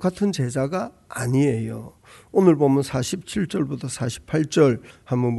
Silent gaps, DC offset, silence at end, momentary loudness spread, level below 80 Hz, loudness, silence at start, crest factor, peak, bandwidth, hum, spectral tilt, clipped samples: none; under 0.1%; 0 s; 11 LU; -54 dBFS; -22 LUFS; 0 s; 18 dB; -4 dBFS; 12 kHz; none; -6.5 dB/octave; under 0.1%